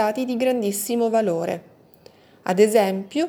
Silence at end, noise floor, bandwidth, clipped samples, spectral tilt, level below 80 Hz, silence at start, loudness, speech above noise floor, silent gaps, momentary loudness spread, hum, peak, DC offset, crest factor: 0 s; -51 dBFS; over 20 kHz; under 0.1%; -5 dB/octave; -70 dBFS; 0 s; -21 LUFS; 30 dB; none; 11 LU; none; -4 dBFS; under 0.1%; 18 dB